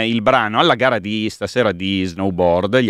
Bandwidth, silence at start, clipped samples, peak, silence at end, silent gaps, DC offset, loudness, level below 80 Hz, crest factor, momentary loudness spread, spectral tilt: 13 kHz; 0 s; under 0.1%; 0 dBFS; 0 s; none; under 0.1%; -17 LUFS; -48 dBFS; 16 dB; 7 LU; -5.5 dB/octave